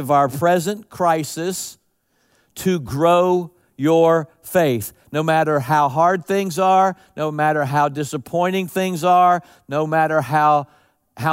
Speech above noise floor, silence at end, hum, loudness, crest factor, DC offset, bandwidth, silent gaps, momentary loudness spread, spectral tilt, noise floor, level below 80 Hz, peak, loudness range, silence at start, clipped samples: 47 dB; 0 s; none; -18 LUFS; 14 dB; under 0.1%; 16 kHz; none; 10 LU; -5.5 dB/octave; -65 dBFS; -58 dBFS; -4 dBFS; 3 LU; 0 s; under 0.1%